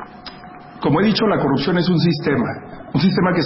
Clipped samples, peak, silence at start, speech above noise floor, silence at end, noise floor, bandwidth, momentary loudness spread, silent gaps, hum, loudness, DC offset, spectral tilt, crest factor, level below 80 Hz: under 0.1%; -4 dBFS; 0 s; 21 dB; 0 s; -38 dBFS; 5.8 kHz; 20 LU; none; none; -18 LUFS; under 0.1%; -10.5 dB/octave; 16 dB; -48 dBFS